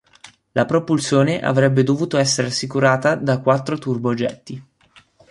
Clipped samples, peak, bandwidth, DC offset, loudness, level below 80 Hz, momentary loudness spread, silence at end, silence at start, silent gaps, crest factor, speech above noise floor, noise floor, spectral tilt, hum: under 0.1%; -2 dBFS; 11.5 kHz; under 0.1%; -18 LUFS; -58 dBFS; 9 LU; 0.7 s; 0.25 s; none; 18 dB; 34 dB; -53 dBFS; -5.5 dB/octave; none